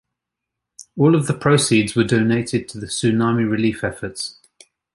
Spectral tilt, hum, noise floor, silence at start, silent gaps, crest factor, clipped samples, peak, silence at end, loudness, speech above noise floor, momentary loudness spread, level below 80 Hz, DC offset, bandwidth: -5.5 dB/octave; none; -82 dBFS; 0.95 s; none; 18 dB; under 0.1%; -2 dBFS; 0.65 s; -19 LUFS; 64 dB; 12 LU; -52 dBFS; under 0.1%; 11.5 kHz